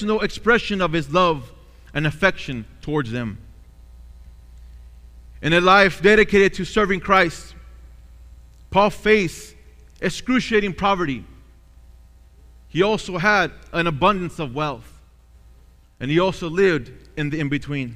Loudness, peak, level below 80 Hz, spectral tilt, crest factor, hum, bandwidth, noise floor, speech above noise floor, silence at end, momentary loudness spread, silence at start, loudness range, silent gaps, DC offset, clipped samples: -20 LUFS; -2 dBFS; -42 dBFS; -5.5 dB/octave; 20 dB; none; 15 kHz; -50 dBFS; 30 dB; 0 s; 15 LU; 0 s; 7 LU; none; under 0.1%; under 0.1%